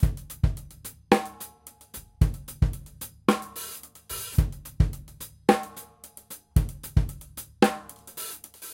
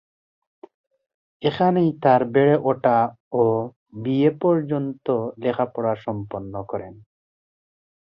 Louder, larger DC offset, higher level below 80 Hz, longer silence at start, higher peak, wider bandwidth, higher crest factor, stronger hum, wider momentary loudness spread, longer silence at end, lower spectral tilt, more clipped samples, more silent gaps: second, -28 LUFS vs -22 LUFS; neither; first, -32 dBFS vs -60 dBFS; second, 0 s vs 1.4 s; about the same, -2 dBFS vs -4 dBFS; first, 17 kHz vs 5.6 kHz; first, 26 dB vs 20 dB; neither; first, 18 LU vs 14 LU; second, 0 s vs 1.25 s; second, -6 dB/octave vs -10 dB/octave; neither; second, none vs 3.20-3.31 s, 3.76-3.86 s